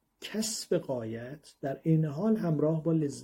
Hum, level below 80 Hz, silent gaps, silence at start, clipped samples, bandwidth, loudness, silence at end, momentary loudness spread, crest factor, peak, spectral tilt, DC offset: none; -68 dBFS; none; 0.2 s; under 0.1%; 16.5 kHz; -31 LUFS; 0 s; 11 LU; 16 dB; -14 dBFS; -6 dB/octave; under 0.1%